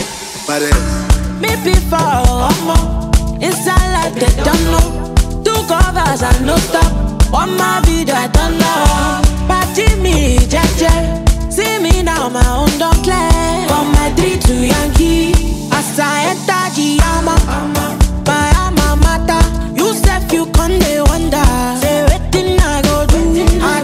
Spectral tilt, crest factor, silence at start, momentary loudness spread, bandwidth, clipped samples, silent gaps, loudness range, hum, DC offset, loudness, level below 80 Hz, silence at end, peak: -5 dB/octave; 12 dB; 0 s; 3 LU; 16 kHz; under 0.1%; none; 1 LU; none; under 0.1%; -13 LUFS; -14 dBFS; 0 s; 0 dBFS